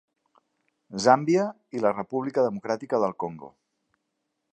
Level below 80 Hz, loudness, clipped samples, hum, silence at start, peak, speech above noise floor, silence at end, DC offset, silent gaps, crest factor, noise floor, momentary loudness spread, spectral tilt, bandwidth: -72 dBFS; -25 LUFS; under 0.1%; none; 0.9 s; -4 dBFS; 55 dB; 1.05 s; under 0.1%; none; 22 dB; -80 dBFS; 14 LU; -5.5 dB/octave; 9.2 kHz